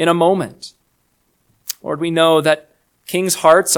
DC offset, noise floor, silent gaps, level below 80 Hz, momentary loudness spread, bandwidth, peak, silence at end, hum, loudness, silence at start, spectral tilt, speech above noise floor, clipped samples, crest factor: under 0.1%; -63 dBFS; none; -64 dBFS; 18 LU; 19.5 kHz; 0 dBFS; 0 s; none; -16 LUFS; 0 s; -3.5 dB/octave; 49 dB; under 0.1%; 16 dB